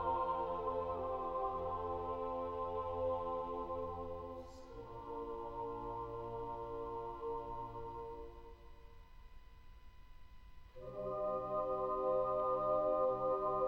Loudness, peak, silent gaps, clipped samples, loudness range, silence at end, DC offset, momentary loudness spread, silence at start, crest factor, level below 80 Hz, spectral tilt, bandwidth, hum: -40 LUFS; -24 dBFS; none; under 0.1%; 12 LU; 0 s; under 0.1%; 15 LU; 0 s; 16 dB; -58 dBFS; -8.5 dB/octave; 6.6 kHz; none